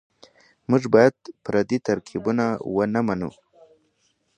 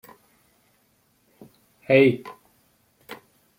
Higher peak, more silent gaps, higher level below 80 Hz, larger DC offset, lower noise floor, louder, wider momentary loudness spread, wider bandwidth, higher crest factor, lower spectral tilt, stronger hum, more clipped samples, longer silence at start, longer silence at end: about the same, -2 dBFS vs -4 dBFS; neither; first, -58 dBFS vs -70 dBFS; neither; about the same, -68 dBFS vs -65 dBFS; about the same, -22 LUFS vs -20 LUFS; second, 13 LU vs 26 LU; second, 9.8 kHz vs 16.5 kHz; about the same, 22 dB vs 24 dB; about the same, -7 dB/octave vs -7.5 dB/octave; neither; neither; second, 0.7 s vs 1.9 s; first, 1.1 s vs 0.45 s